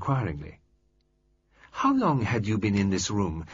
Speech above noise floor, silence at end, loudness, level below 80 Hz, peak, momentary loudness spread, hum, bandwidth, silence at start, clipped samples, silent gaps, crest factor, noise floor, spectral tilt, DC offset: 43 dB; 0 s; -26 LUFS; -50 dBFS; -12 dBFS; 15 LU; none; 7.8 kHz; 0 s; under 0.1%; none; 16 dB; -69 dBFS; -6 dB/octave; under 0.1%